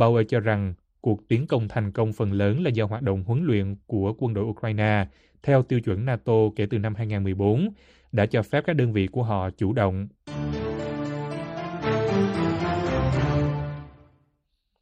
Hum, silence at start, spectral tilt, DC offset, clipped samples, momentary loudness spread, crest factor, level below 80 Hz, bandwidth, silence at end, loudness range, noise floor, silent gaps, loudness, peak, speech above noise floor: none; 0 s; -8.5 dB/octave; under 0.1%; under 0.1%; 8 LU; 18 dB; -46 dBFS; 8.6 kHz; 0.9 s; 3 LU; -74 dBFS; none; -25 LUFS; -6 dBFS; 50 dB